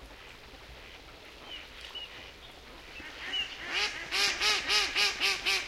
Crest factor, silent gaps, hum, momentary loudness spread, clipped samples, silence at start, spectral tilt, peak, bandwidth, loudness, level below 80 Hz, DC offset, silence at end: 22 dB; none; none; 23 LU; under 0.1%; 0 s; 0.5 dB/octave; -12 dBFS; 16 kHz; -28 LUFS; -56 dBFS; under 0.1%; 0 s